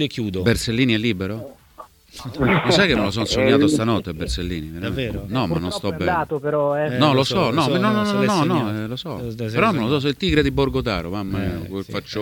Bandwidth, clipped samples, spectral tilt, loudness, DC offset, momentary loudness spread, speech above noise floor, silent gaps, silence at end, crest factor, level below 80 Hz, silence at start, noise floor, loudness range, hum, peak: 19 kHz; under 0.1%; -5.5 dB/octave; -20 LUFS; under 0.1%; 12 LU; 25 dB; none; 0 s; 18 dB; -38 dBFS; 0 s; -45 dBFS; 2 LU; none; -2 dBFS